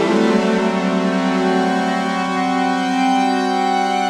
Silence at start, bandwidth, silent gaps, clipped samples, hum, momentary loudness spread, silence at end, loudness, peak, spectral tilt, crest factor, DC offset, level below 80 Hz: 0 s; 12 kHz; none; under 0.1%; none; 3 LU; 0 s; -17 LUFS; -2 dBFS; -5.5 dB/octave; 14 dB; under 0.1%; -58 dBFS